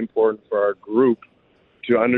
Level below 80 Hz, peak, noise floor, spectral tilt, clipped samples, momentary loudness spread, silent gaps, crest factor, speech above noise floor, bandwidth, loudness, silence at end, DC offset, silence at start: -66 dBFS; -6 dBFS; -59 dBFS; -9.5 dB/octave; under 0.1%; 7 LU; none; 14 dB; 40 dB; 4.1 kHz; -21 LUFS; 0 s; under 0.1%; 0 s